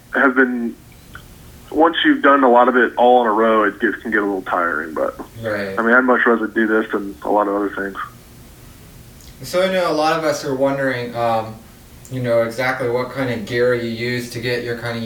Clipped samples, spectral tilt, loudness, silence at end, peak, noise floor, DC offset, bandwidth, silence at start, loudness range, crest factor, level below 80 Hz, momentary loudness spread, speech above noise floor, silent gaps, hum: under 0.1%; -5.5 dB/octave; -17 LUFS; 0 s; -2 dBFS; -41 dBFS; under 0.1%; over 20 kHz; 0.1 s; 7 LU; 18 dB; -50 dBFS; 12 LU; 24 dB; none; none